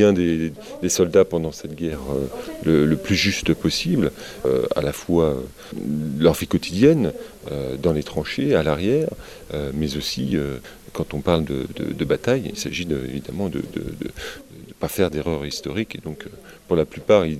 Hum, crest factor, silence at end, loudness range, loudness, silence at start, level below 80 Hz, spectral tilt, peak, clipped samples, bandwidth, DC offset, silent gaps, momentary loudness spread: none; 20 dB; 0 s; 6 LU; -22 LUFS; 0 s; -42 dBFS; -5.5 dB/octave; -2 dBFS; under 0.1%; 16 kHz; 0.1%; none; 13 LU